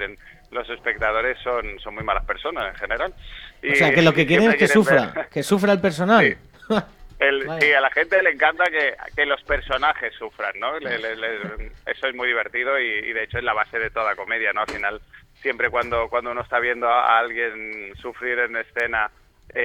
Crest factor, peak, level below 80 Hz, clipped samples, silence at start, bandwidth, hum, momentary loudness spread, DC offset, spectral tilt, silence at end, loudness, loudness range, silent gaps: 20 dB; -2 dBFS; -44 dBFS; under 0.1%; 0 s; 17 kHz; none; 14 LU; under 0.1%; -5 dB/octave; 0 s; -21 LUFS; 7 LU; none